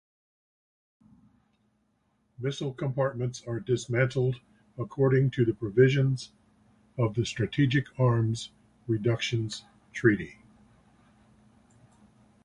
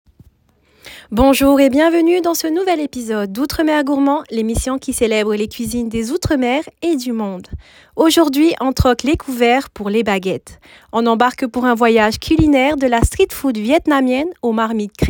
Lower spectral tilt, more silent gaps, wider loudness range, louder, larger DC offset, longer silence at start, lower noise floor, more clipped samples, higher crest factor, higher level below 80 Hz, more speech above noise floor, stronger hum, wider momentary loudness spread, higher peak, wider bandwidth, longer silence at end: first, -6.5 dB/octave vs -5 dB/octave; neither; first, 7 LU vs 3 LU; second, -28 LUFS vs -16 LUFS; neither; first, 2.4 s vs 0.85 s; first, -72 dBFS vs -56 dBFS; neither; first, 22 dB vs 14 dB; second, -58 dBFS vs -32 dBFS; first, 45 dB vs 41 dB; neither; first, 17 LU vs 9 LU; second, -8 dBFS vs 0 dBFS; second, 10.5 kHz vs 18.5 kHz; first, 2.1 s vs 0 s